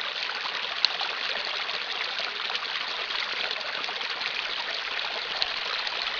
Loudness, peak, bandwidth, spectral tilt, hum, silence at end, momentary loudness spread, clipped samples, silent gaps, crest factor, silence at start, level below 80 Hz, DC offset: -28 LUFS; 0 dBFS; 5.4 kHz; 0.5 dB/octave; none; 0 s; 4 LU; under 0.1%; none; 30 dB; 0 s; -68 dBFS; under 0.1%